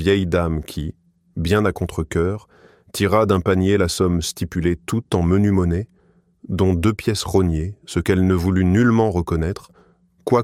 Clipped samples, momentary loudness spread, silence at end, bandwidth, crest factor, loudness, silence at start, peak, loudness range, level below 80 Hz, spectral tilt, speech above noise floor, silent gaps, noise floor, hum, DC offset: under 0.1%; 12 LU; 0 s; 15.5 kHz; 16 dB; -20 LUFS; 0 s; -2 dBFS; 2 LU; -36 dBFS; -6.5 dB/octave; 36 dB; none; -55 dBFS; none; under 0.1%